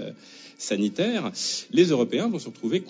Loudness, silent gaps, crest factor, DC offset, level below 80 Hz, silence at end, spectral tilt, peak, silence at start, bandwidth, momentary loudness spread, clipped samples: -25 LUFS; none; 20 dB; under 0.1%; -78 dBFS; 0 s; -4.5 dB/octave; -6 dBFS; 0 s; 8 kHz; 17 LU; under 0.1%